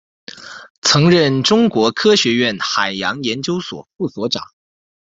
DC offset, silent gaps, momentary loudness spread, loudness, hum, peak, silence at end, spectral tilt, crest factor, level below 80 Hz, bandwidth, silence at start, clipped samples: under 0.1%; 0.70-0.82 s; 17 LU; -15 LUFS; none; 0 dBFS; 0.7 s; -4 dB/octave; 16 dB; -54 dBFS; 8.2 kHz; 0.35 s; under 0.1%